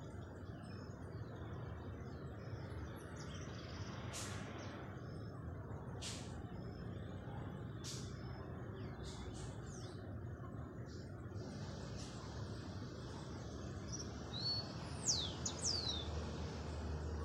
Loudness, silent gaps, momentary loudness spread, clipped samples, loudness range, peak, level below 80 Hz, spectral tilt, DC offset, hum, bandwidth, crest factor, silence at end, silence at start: -46 LUFS; none; 10 LU; under 0.1%; 8 LU; -24 dBFS; -56 dBFS; -4 dB/octave; under 0.1%; none; 15.5 kHz; 22 dB; 0 s; 0 s